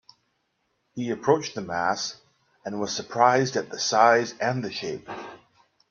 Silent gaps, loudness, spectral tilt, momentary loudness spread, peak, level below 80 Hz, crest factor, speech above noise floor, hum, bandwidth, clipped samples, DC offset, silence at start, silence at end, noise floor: none; -24 LUFS; -4 dB/octave; 18 LU; -4 dBFS; -68 dBFS; 22 dB; 49 dB; none; 7.4 kHz; under 0.1%; under 0.1%; 0.95 s; 0.55 s; -74 dBFS